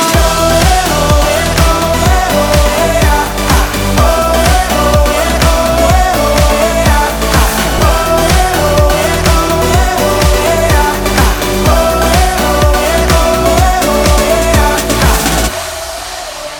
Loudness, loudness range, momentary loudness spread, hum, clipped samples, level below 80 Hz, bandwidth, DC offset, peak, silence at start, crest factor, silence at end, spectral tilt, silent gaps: -10 LUFS; 1 LU; 2 LU; none; under 0.1%; -14 dBFS; over 20 kHz; under 0.1%; 0 dBFS; 0 s; 10 dB; 0 s; -4 dB/octave; none